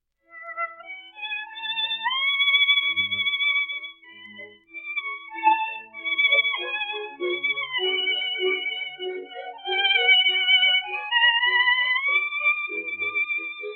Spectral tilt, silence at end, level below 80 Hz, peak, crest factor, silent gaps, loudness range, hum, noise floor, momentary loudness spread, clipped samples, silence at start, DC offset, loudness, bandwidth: -4.5 dB/octave; 0 s; -80 dBFS; -6 dBFS; 18 dB; none; 6 LU; none; -45 dBFS; 16 LU; under 0.1%; 0.35 s; under 0.1%; -21 LUFS; 4.4 kHz